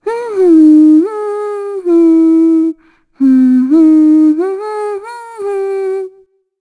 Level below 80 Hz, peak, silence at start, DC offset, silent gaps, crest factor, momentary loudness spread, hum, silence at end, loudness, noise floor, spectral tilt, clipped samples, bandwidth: -64 dBFS; 0 dBFS; 0.05 s; under 0.1%; none; 10 dB; 14 LU; none; 0.5 s; -10 LUFS; -47 dBFS; -6.5 dB/octave; under 0.1%; 10 kHz